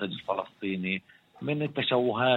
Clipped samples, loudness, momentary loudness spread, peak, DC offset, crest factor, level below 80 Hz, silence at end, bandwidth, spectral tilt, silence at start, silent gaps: under 0.1%; -30 LUFS; 8 LU; -10 dBFS; under 0.1%; 20 dB; -70 dBFS; 0 s; 7.8 kHz; -8 dB/octave; 0 s; none